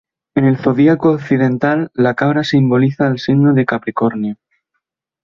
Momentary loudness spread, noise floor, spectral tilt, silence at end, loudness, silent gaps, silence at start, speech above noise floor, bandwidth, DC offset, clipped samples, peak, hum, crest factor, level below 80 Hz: 6 LU; -74 dBFS; -8.5 dB/octave; 0.9 s; -14 LUFS; none; 0.35 s; 60 dB; 7.2 kHz; under 0.1%; under 0.1%; -2 dBFS; none; 14 dB; -54 dBFS